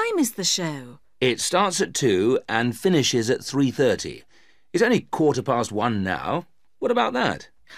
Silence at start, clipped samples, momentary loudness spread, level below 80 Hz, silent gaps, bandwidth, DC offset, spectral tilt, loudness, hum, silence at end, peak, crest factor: 0 s; under 0.1%; 8 LU; -60 dBFS; none; 15.5 kHz; 0.2%; -4 dB/octave; -22 LUFS; none; 0 s; -4 dBFS; 18 dB